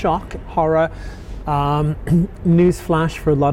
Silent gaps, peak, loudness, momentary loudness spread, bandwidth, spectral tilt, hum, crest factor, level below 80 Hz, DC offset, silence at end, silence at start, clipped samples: none; -6 dBFS; -18 LUFS; 10 LU; 14 kHz; -8 dB/octave; none; 12 dB; -32 dBFS; under 0.1%; 0 s; 0 s; under 0.1%